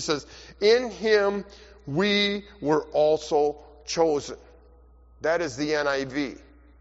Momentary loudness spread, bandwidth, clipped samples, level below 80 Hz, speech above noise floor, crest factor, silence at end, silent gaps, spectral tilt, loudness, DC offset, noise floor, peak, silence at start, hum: 14 LU; 8 kHz; under 0.1%; -54 dBFS; 28 dB; 18 dB; 0.45 s; none; -3 dB/octave; -25 LUFS; under 0.1%; -53 dBFS; -8 dBFS; 0 s; none